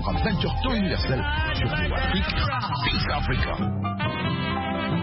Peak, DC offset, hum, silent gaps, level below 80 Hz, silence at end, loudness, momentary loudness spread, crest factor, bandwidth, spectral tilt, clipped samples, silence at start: -10 dBFS; under 0.1%; none; none; -32 dBFS; 0 s; -25 LUFS; 2 LU; 14 dB; 5.8 kHz; -10 dB/octave; under 0.1%; 0 s